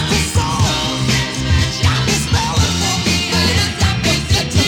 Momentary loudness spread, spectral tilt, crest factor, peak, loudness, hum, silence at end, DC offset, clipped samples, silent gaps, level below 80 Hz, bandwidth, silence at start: 2 LU; -3.5 dB/octave; 14 dB; -2 dBFS; -15 LUFS; none; 0 s; under 0.1%; under 0.1%; none; -26 dBFS; 18 kHz; 0 s